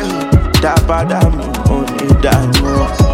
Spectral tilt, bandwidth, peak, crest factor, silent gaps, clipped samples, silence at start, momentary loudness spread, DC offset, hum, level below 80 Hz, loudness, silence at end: -6 dB/octave; 16.5 kHz; 0 dBFS; 12 dB; none; under 0.1%; 0 s; 4 LU; under 0.1%; none; -18 dBFS; -13 LUFS; 0 s